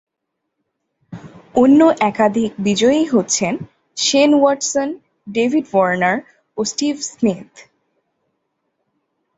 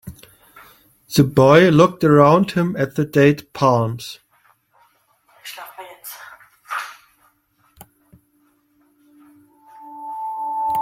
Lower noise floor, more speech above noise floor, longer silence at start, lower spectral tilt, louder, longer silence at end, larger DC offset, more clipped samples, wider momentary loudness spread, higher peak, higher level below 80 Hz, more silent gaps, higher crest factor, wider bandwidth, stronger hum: first, -77 dBFS vs -61 dBFS; first, 61 dB vs 47 dB; first, 1.1 s vs 0.05 s; second, -4 dB/octave vs -6.5 dB/octave; about the same, -16 LUFS vs -16 LUFS; first, 1.75 s vs 0 s; neither; neither; second, 17 LU vs 24 LU; about the same, -2 dBFS vs 0 dBFS; about the same, -58 dBFS vs -54 dBFS; neither; about the same, 16 dB vs 20 dB; second, 8.4 kHz vs 16.5 kHz; neither